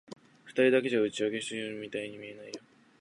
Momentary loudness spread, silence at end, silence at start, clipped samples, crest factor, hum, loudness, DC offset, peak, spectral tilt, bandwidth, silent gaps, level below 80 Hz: 20 LU; 0.4 s; 0.1 s; under 0.1%; 20 dB; none; -30 LUFS; under 0.1%; -12 dBFS; -4.5 dB/octave; 11 kHz; none; -78 dBFS